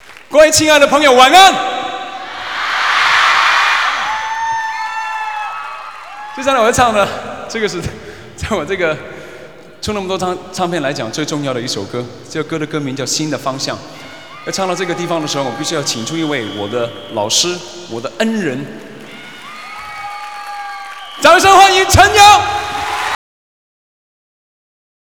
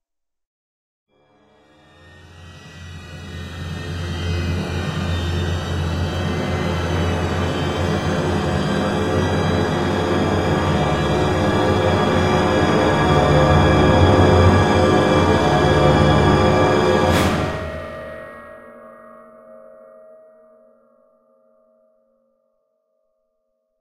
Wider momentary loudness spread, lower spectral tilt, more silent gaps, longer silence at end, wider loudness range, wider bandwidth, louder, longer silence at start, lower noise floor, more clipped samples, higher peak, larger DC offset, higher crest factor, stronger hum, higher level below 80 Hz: first, 21 LU vs 16 LU; second, -2.5 dB/octave vs -6.5 dB/octave; neither; second, 2 s vs 4.2 s; second, 10 LU vs 15 LU; first, over 20 kHz vs 14 kHz; first, -13 LUFS vs -18 LUFS; second, 0.1 s vs 2.25 s; second, -36 dBFS vs -71 dBFS; first, 0.6% vs under 0.1%; about the same, 0 dBFS vs 0 dBFS; first, 0.7% vs under 0.1%; about the same, 14 dB vs 18 dB; neither; second, -40 dBFS vs -34 dBFS